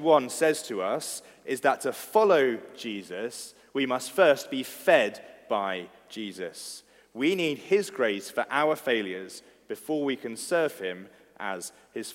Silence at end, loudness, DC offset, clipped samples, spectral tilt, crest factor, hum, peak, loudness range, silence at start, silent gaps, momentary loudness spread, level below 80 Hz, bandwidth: 0 s; -27 LUFS; under 0.1%; under 0.1%; -3.5 dB/octave; 22 dB; none; -6 dBFS; 4 LU; 0 s; none; 17 LU; -78 dBFS; 16.5 kHz